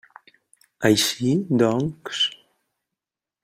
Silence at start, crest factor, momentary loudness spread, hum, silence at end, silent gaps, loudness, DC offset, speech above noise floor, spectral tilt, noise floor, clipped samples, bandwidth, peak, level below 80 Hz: 0.8 s; 22 dB; 6 LU; none; 1.1 s; none; -21 LUFS; under 0.1%; 66 dB; -4 dB/octave; -87 dBFS; under 0.1%; 16 kHz; -4 dBFS; -60 dBFS